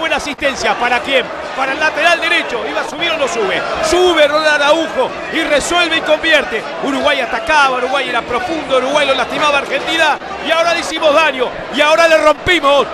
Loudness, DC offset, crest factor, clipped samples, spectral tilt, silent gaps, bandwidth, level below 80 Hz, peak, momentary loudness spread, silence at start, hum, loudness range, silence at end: -13 LUFS; under 0.1%; 14 dB; under 0.1%; -2.5 dB/octave; none; 13.5 kHz; -42 dBFS; 0 dBFS; 8 LU; 0 s; none; 2 LU; 0 s